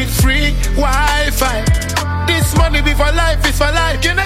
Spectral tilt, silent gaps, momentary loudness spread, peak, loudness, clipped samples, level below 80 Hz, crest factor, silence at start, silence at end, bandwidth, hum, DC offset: -4 dB/octave; none; 3 LU; 0 dBFS; -14 LUFS; under 0.1%; -16 dBFS; 12 dB; 0 s; 0 s; 16 kHz; none; under 0.1%